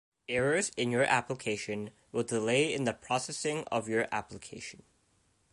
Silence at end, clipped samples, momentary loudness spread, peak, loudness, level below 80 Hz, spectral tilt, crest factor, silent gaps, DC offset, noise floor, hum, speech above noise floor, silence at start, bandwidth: 0.8 s; under 0.1%; 13 LU; -12 dBFS; -31 LUFS; -66 dBFS; -4 dB/octave; 22 dB; none; under 0.1%; -71 dBFS; none; 39 dB; 0.3 s; 11.5 kHz